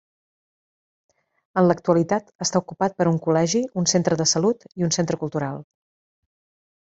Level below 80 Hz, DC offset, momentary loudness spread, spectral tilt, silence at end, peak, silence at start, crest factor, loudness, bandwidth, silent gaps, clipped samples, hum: -62 dBFS; under 0.1%; 7 LU; -4.5 dB/octave; 1.2 s; -4 dBFS; 1.55 s; 20 dB; -22 LUFS; 8 kHz; 2.35-2.39 s; under 0.1%; none